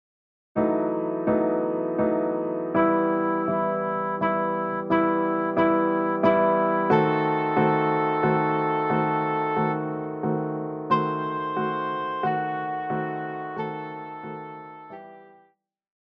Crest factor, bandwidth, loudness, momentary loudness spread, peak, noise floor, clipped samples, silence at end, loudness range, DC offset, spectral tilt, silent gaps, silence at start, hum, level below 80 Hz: 16 dB; 5.6 kHz; -24 LUFS; 11 LU; -8 dBFS; -63 dBFS; under 0.1%; 0.8 s; 8 LU; under 0.1%; -9.5 dB/octave; none; 0.55 s; none; -62 dBFS